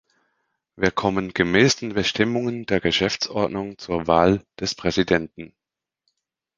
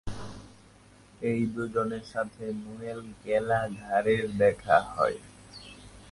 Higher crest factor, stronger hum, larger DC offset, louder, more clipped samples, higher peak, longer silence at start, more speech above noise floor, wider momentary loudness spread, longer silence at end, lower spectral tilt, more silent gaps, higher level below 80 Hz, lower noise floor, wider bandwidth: about the same, 22 dB vs 22 dB; neither; neither; first, -22 LUFS vs -29 LUFS; neither; first, -2 dBFS vs -8 dBFS; first, 0.8 s vs 0.05 s; first, 66 dB vs 27 dB; second, 10 LU vs 21 LU; first, 1.1 s vs 0 s; second, -4.5 dB/octave vs -6.5 dB/octave; neither; first, -48 dBFS vs -54 dBFS; first, -88 dBFS vs -56 dBFS; second, 9.8 kHz vs 11.5 kHz